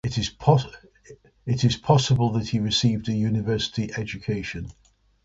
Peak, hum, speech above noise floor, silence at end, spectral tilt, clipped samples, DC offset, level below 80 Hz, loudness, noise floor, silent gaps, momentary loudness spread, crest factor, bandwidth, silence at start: -4 dBFS; none; 27 dB; 0.55 s; -5.5 dB/octave; under 0.1%; under 0.1%; -46 dBFS; -24 LUFS; -50 dBFS; none; 13 LU; 20 dB; 7.8 kHz; 0.05 s